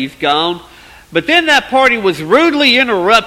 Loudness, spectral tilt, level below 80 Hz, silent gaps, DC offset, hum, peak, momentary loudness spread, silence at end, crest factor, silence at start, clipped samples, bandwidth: -11 LUFS; -3.5 dB/octave; -46 dBFS; none; under 0.1%; none; 0 dBFS; 9 LU; 0 s; 12 dB; 0 s; 0.1%; 16 kHz